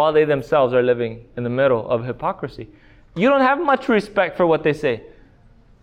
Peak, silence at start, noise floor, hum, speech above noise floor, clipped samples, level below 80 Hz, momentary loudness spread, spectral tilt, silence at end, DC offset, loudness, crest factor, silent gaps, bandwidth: -6 dBFS; 0 s; -50 dBFS; none; 31 dB; under 0.1%; -50 dBFS; 13 LU; -7.5 dB/octave; 0.8 s; under 0.1%; -19 LUFS; 14 dB; none; 10 kHz